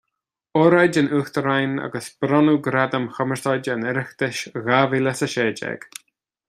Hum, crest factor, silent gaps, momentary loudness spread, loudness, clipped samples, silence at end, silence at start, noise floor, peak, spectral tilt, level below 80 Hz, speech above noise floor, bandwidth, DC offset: none; 18 dB; none; 12 LU; -21 LUFS; under 0.1%; 0.65 s; 0.55 s; -82 dBFS; -2 dBFS; -5.5 dB/octave; -64 dBFS; 61 dB; 15 kHz; under 0.1%